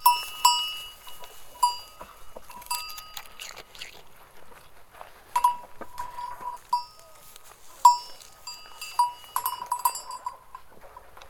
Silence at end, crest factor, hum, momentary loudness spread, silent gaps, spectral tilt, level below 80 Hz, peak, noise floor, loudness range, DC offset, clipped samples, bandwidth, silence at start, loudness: 0 s; 26 dB; none; 26 LU; none; 1 dB/octave; -58 dBFS; -4 dBFS; -49 dBFS; 7 LU; under 0.1%; under 0.1%; 19 kHz; 0 s; -27 LUFS